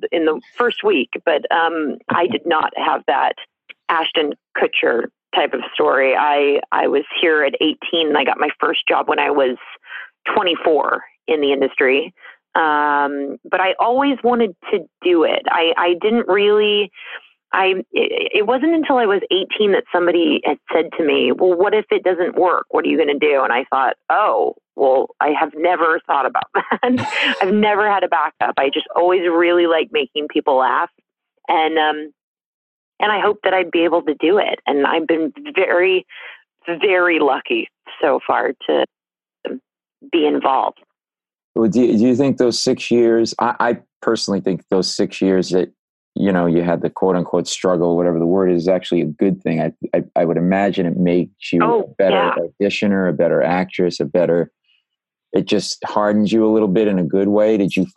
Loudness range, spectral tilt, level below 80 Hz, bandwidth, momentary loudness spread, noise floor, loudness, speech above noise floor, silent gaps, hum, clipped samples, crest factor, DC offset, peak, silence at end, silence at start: 3 LU; -5 dB/octave; -64 dBFS; 11 kHz; 6 LU; under -90 dBFS; -17 LUFS; over 73 dB; 32.23-32.35 s, 32.46-32.92 s, 41.44-41.55 s, 43.96-44.01 s, 45.79-46.12 s; none; under 0.1%; 16 dB; under 0.1%; 0 dBFS; 0.05 s; 0 s